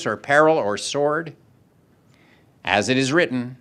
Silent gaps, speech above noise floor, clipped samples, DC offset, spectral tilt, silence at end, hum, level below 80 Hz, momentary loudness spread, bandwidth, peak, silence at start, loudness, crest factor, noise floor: none; 37 dB; under 0.1%; under 0.1%; -4 dB/octave; 0.05 s; none; -64 dBFS; 10 LU; 12 kHz; 0 dBFS; 0 s; -20 LUFS; 22 dB; -57 dBFS